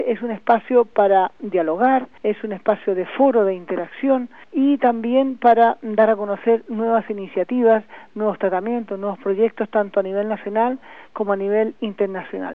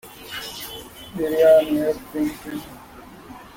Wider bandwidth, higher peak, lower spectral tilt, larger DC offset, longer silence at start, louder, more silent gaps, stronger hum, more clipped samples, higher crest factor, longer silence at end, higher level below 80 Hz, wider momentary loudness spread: second, 4.6 kHz vs 17 kHz; about the same, -4 dBFS vs -4 dBFS; first, -9 dB/octave vs -5 dB/octave; first, 0.4% vs under 0.1%; about the same, 0 s vs 0.05 s; about the same, -20 LUFS vs -20 LUFS; neither; neither; neither; about the same, 16 dB vs 18 dB; about the same, 0 s vs 0.1 s; second, -66 dBFS vs -52 dBFS; second, 9 LU vs 27 LU